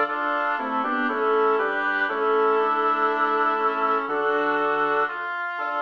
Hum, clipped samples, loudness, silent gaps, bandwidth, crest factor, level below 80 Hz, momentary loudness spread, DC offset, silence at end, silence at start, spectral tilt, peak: none; under 0.1%; -22 LUFS; none; 6.2 kHz; 12 dB; -74 dBFS; 4 LU; 0.1%; 0 s; 0 s; -5 dB/octave; -10 dBFS